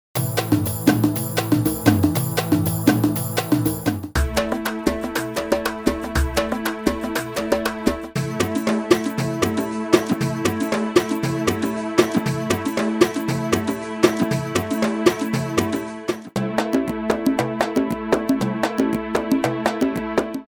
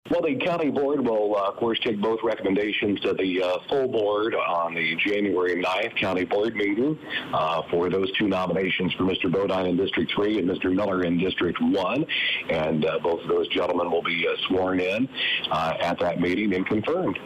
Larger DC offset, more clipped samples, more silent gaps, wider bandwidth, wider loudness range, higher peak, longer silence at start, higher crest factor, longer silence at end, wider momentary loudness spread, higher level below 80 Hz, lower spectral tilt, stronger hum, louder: neither; neither; neither; first, over 20 kHz vs 10 kHz; about the same, 3 LU vs 1 LU; first, 0 dBFS vs -16 dBFS; about the same, 0.15 s vs 0.05 s; first, 20 dB vs 8 dB; about the same, 0.05 s vs 0 s; first, 5 LU vs 2 LU; first, -38 dBFS vs -58 dBFS; about the same, -5.5 dB/octave vs -6.5 dB/octave; neither; first, -21 LUFS vs -24 LUFS